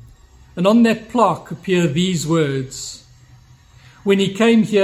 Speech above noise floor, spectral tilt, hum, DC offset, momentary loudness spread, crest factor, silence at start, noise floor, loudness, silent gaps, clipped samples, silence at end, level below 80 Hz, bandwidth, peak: 31 dB; -5.5 dB/octave; none; under 0.1%; 15 LU; 18 dB; 0.55 s; -47 dBFS; -17 LUFS; none; under 0.1%; 0 s; -52 dBFS; 14 kHz; 0 dBFS